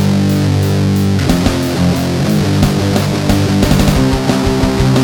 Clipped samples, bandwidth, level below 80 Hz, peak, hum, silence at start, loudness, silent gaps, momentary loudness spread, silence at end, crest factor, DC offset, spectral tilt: under 0.1%; over 20 kHz; -24 dBFS; 0 dBFS; none; 0 s; -13 LUFS; none; 3 LU; 0 s; 12 dB; under 0.1%; -6 dB/octave